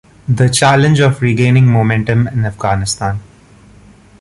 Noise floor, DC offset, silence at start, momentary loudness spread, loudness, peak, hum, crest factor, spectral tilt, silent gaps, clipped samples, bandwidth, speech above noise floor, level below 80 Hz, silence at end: -42 dBFS; under 0.1%; 0.3 s; 9 LU; -12 LUFS; 0 dBFS; none; 12 dB; -5.5 dB/octave; none; under 0.1%; 11.5 kHz; 31 dB; -38 dBFS; 0.95 s